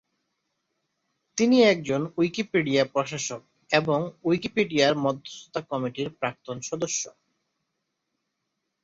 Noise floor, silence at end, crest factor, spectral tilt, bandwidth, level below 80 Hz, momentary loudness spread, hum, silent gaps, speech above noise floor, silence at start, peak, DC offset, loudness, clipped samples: -80 dBFS; 1.75 s; 20 dB; -4.5 dB/octave; 7.8 kHz; -66 dBFS; 14 LU; none; none; 55 dB; 1.35 s; -8 dBFS; under 0.1%; -25 LUFS; under 0.1%